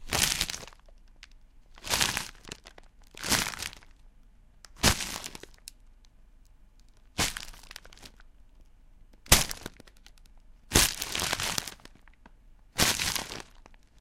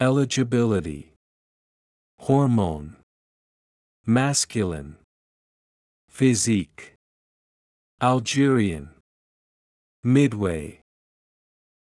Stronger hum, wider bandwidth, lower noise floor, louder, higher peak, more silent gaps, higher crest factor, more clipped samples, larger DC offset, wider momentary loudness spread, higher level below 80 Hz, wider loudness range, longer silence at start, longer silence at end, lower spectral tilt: neither; first, 16.5 kHz vs 12 kHz; second, -56 dBFS vs under -90 dBFS; second, -28 LUFS vs -22 LUFS; first, -2 dBFS vs -6 dBFS; second, none vs 1.16-2.18 s, 3.03-4.04 s, 5.04-6.08 s, 6.96-7.98 s, 9.00-10.03 s; first, 32 dB vs 18 dB; neither; neither; first, 24 LU vs 16 LU; first, -44 dBFS vs -54 dBFS; first, 11 LU vs 4 LU; about the same, 0 s vs 0 s; second, 0.25 s vs 1.1 s; second, -1.5 dB/octave vs -5.5 dB/octave